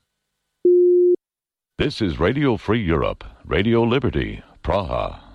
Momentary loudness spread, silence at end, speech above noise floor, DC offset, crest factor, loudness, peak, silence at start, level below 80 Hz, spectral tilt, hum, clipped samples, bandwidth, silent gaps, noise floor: 11 LU; 0.15 s; 69 dB; under 0.1%; 12 dB; -20 LUFS; -8 dBFS; 0.65 s; -36 dBFS; -8 dB/octave; none; under 0.1%; 6.4 kHz; none; -90 dBFS